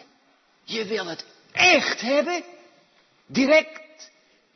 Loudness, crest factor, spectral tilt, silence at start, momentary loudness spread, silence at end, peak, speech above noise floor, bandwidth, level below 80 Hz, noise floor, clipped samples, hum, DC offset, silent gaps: -21 LUFS; 20 dB; -2.5 dB/octave; 0.7 s; 19 LU; 0.5 s; -6 dBFS; 40 dB; 6.4 kHz; -70 dBFS; -62 dBFS; under 0.1%; none; under 0.1%; none